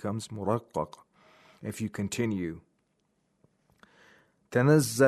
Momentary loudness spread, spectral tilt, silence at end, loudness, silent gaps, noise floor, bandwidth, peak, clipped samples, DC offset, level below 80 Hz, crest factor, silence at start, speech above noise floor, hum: 17 LU; -6 dB/octave; 0 s; -30 LUFS; none; -74 dBFS; 13.5 kHz; -10 dBFS; under 0.1%; under 0.1%; -66 dBFS; 20 dB; 0 s; 47 dB; none